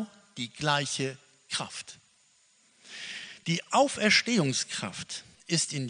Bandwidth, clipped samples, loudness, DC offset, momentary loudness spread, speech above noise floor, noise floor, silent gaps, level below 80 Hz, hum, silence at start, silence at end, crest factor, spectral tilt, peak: 10 kHz; under 0.1%; -29 LUFS; under 0.1%; 18 LU; 36 dB; -65 dBFS; none; -72 dBFS; none; 0 s; 0 s; 22 dB; -3 dB/octave; -8 dBFS